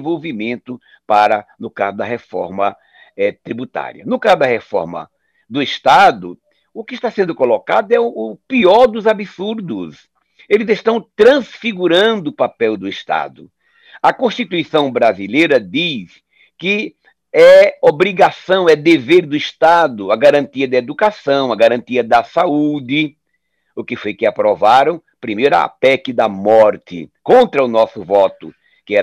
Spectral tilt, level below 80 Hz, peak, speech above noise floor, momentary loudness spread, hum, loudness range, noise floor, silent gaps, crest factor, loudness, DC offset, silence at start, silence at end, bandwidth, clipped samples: -5.5 dB/octave; -58 dBFS; -2 dBFS; 55 dB; 14 LU; none; 7 LU; -69 dBFS; none; 14 dB; -14 LUFS; under 0.1%; 0 s; 0 s; 11.5 kHz; under 0.1%